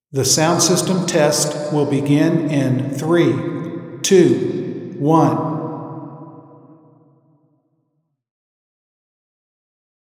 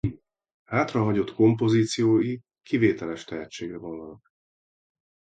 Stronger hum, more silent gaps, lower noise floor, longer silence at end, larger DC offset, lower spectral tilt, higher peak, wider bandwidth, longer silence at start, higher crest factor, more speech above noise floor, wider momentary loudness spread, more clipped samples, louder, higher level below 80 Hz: neither; second, none vs 0.54-0.65 s; second, -70 dBFS vs under -90 dBFS; first, 3.7 s vs 1.1 s; neither; second, -4.5 dB/octave vs -6.5 dB/octave; first, 0 dBFS vs -8 dBFS; first, 16 kHz vs 9.2 kHz; about the same, 0.15 s vs 0.05 s; about the same, 18 dB vs 18 dB; second, 55 dB vs over 66 dB; about the same, 15 LU vs 15 LU; neither; first, -17 LUFS vs -24 LUFS; second, -64 dBFS vs -54 dBFS